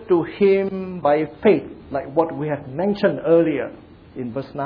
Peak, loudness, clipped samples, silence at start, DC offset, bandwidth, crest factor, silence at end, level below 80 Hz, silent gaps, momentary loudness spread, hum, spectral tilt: -2 dBFS; -20 LUFS; under 0.1%; 0 s; under 0.1%; 5.2 kHz; 18 dB; 0 s; -54 dBFS; none; 12 LU; none; -10 dB/octave